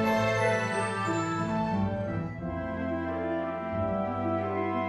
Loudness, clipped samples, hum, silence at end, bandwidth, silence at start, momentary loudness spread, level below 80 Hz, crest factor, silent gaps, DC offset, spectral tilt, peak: -30 LUFS; under 0.1%; none; 0 s; 12 kHz; 0 s; 7 LU; -52 dBFS; 14 dB; none; under 0.1%; -6.5 dB/octave; -16 dBFS